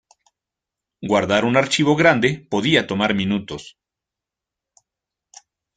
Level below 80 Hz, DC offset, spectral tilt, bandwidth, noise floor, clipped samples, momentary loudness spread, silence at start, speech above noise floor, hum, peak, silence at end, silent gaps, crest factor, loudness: -56 dBFS; under 0.1%; -5 dB/octave; 9.4 kHz; -86 dBFS; under 0.1%; 12 LU; 1 s; 68 dB; none; -2 dBFS; 2.05 s; none; 20 dB; -18 LUFS